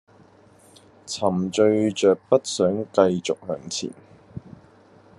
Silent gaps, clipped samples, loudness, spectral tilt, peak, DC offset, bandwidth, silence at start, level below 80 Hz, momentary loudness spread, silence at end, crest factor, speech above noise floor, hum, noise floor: none; under 0.1%; -22 LUFS; -5 dB/octave; -2 dBFS; under 0.1%; 11.5 kHz; 1.05 s; -66 dBFS; 20 LU; 0.8 s; 22 dB; 31 dB; none; -53 dBFS